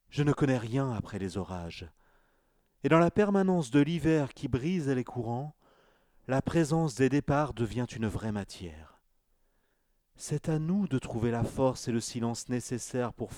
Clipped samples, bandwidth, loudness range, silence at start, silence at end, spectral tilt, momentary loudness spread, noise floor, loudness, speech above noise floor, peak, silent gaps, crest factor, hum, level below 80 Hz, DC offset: under 0.1%; 14.5 kHz; 7 LU; 0.15 s; 0 s; -6.5 dB/octave; 11 LU; -73 dBFS; -30 LUFS; 44 dB; -10 dBFS; none; 20 dB; none; -54 dBFS; under 0.1%